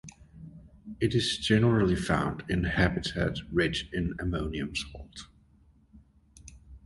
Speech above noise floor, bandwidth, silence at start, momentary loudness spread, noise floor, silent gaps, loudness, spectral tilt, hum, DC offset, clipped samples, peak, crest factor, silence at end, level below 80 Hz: 33 dB; 11.5 kHz; 0.05 s; 24 LU; -61 dBFS; none; -28 LUFS; -5.5 dB/octave; none; under 0.1%; under 0.1%; -8 dBFS; 22 dB; 0.05 s; -44 dBFS